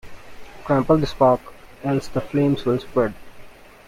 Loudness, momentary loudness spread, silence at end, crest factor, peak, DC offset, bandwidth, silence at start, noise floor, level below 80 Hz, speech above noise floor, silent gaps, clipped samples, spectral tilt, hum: -21 LUFS; 7 LU; 0.35 s; 18 dB; -4 dBFS; under 0.1%; 15.5 kHz; 0.05 s; -41 dBFS; -44 dBFS; 22 dB; none; under 0.1%; -7.5 dB/octave; none